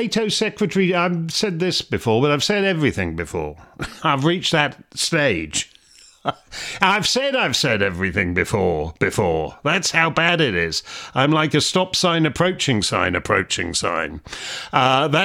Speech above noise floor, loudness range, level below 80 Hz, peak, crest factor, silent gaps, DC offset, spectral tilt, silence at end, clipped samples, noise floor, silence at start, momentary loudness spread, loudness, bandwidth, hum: 30 dB; 3 LU; -48 dBFS; 0 dBFS; 20 dB; none; under 0.1%; -4 dB/octave; 0 s; under 0.1%; -50 dBFS; 0 s; 11 LU; -19 LUFS; 16.5 kHz; none